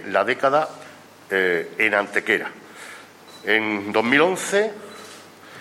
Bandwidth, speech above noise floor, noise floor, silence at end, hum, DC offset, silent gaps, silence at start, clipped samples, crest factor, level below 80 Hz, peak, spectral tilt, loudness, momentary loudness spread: 16 kHz; 23 dB; -44 dBFS; 0 s; none; under 0.1%; none; 0 s; under 0.1%; 20 dB; -72 dBFS; -2 dBFS; -3.5 dB/octave; -21 LUFS; 21 LU